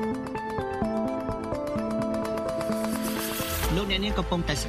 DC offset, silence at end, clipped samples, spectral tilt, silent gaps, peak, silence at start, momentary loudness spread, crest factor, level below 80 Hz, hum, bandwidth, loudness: under 0.1%; 0 s; under 0.1%; -4.5 dB/octave; none; -10 dBFS; 0 s; 5 LU; 18 dB; -38 dBFS; none; 15.5 kHz; -29 LUFS